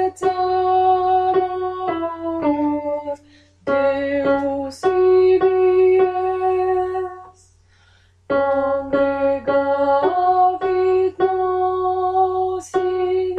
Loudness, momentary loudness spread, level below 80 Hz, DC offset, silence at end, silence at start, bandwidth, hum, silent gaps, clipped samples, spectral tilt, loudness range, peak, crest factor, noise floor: -18 LUFS; 9 LU; -54 dBFS; under 0.1%; 0 s; 0 s; 9.2 kHz; none; none; under 0.1%; -6.5 dB/octave; 4 LU; -8 dBFS; 12 dB; -54 dBFS